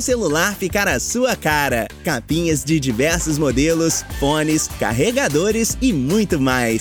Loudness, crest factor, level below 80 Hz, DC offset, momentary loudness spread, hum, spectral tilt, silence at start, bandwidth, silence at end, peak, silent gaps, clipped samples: -18 LUFS; 14 dB; -34 dBFS; under 0.1%; 3 LU; none; -4 dB/octave; 0 s; over 20 kHz; 0 s; -4 dBFS; none; under 0.1%